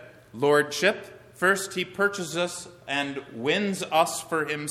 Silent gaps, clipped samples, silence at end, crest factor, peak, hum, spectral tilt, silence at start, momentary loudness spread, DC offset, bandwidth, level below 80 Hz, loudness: none; under 0.1%; 0 s; 20 dB; -6 dBFS; none; -3.5 dB/octave; 0 s; 10 LU; under 0.1%; 16 kHz; -68 dBFS; -26 LUFS